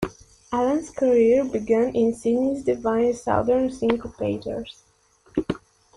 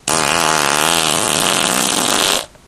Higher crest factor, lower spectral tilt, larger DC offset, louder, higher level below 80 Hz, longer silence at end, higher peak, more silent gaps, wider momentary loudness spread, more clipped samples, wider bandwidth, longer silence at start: about the same, 16 dB vs 16 dB; first, -6.5 dB/octave vs -1 dB/octave; neither; second, -23 LUFS vs -13 LUFS; about the same, -50 dBFS vs -46 dBFS; first, 0.4 s vs 0.2 s; second, -8 dBFS vs 0 dBFS; neither; first, 13 LU vs 1 LU; neither; second, 11.5 kHz vs 17.5 kHz; about the same, 0 s vs 0.05 s